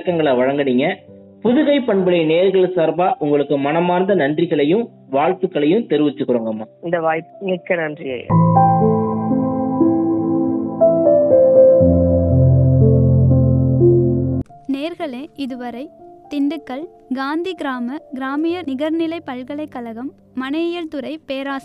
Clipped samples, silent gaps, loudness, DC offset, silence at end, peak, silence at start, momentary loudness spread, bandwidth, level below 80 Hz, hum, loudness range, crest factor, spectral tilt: under 0.1%; none; -16 LUFS; under 0.1%; 0.05 s; 0 dBFS; 0 s; 15 LU; 5.2 kHz; -40 dBFS; none; 11 LU; 16 dB; -9.5 dB/octave